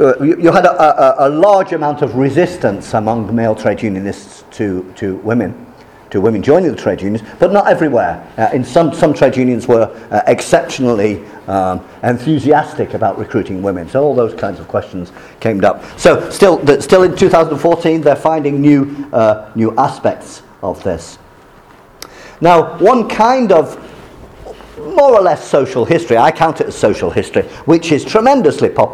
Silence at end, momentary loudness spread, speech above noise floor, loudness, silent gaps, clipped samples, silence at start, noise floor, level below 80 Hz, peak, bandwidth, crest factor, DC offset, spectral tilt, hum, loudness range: 0 s; 11 LU; 29 dB; -12 LUFS; none; 0.4%; 0 s; -41 dBFS; -44 dBFS; 0 dBFS; 14 kHz; 12 dB; under 0.1%; -6.5 dB/octave; none; 5 LU